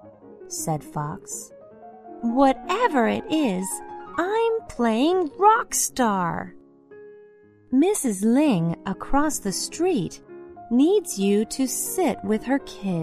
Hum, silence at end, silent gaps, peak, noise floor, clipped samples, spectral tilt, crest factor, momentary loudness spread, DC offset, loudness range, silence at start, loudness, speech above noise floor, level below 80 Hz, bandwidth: none; 0 s; none; -4 dBFS; -52 dBFS; under 0.1%; -4.5 dB/octave; 18 dB; 14 LU; under 0.1%; 2 LU; 0.05 s; -23 LUFS; 30 dB; -48 dBFS; 14 kHz